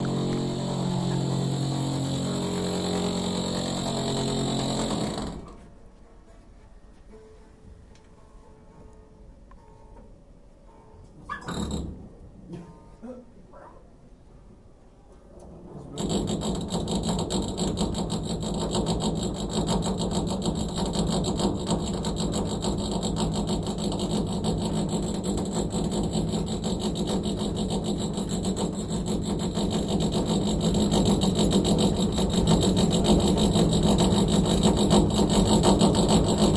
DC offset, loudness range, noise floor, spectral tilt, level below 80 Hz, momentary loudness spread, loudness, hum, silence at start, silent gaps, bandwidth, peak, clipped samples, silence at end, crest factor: under 0.1%; 17 LU; -51 dBFS; -5.5 dB/octave; -38 dBFS; 9 LU; -26 LUFS; none; 0 s; none; 11.5 kHz; -6 dBFS; under 0.1%; 0 s; 20 dB